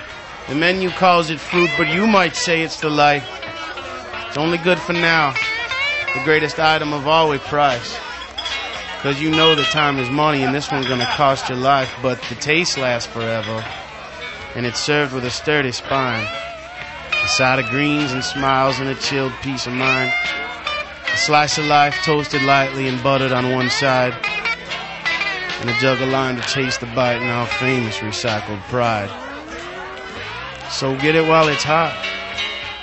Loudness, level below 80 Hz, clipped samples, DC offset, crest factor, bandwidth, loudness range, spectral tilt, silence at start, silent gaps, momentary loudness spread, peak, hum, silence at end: -18 LUFS; -48 dBFS; under 0.1%; under 0.1%; 18 dB; 8.4 kHz; 4 LU; -4 dB/octave; 0 s; none; 13 LU; 0 dBFS; none; 0 s